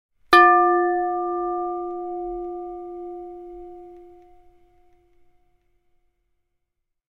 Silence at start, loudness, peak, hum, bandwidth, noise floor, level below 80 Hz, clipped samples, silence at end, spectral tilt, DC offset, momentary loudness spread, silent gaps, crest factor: 0.3 s; -20 LUFS; -2 dBFS; none; 12.5 kHz; -78 dBFS; -56 dBFS; under 0.1%; 3.05 s; -3.5 dB/octave; under 0.1%; 25 LU; none; 24 dB